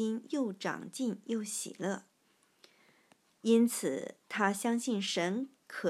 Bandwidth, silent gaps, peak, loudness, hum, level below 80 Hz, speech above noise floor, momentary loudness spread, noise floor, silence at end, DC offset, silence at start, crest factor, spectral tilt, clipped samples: 13.5 kHz; none; -14 dBFS; -34 LUFS; none; under -90 dBFS; 38 dB; 11 LU; -71 dBFS; 0 s; under 0.1%; 0 s; 20 dB; -4 dB/octave; under 0.1%